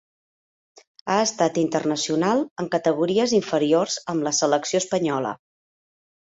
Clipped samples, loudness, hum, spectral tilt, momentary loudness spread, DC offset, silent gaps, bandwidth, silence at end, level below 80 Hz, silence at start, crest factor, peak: under 0.1%; -22 LUFS; none; -4 dB/octave; 5 LU; under 0.1%; 2.51-2.56 s; 8.2 kHz; 0.95 s; -66 dBFS; 1.05 s; 18 dB; -6 dBFS